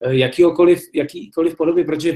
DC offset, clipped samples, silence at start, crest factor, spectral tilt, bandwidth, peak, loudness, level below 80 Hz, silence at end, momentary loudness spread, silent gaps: under 0.1%; under 0.1%; 0 s; 14 dB; -6.5 dB/octave; 13.5 kHz; -2 dBFS; -17 LUFS; -54 dBFS; 0 s; 10 LU; none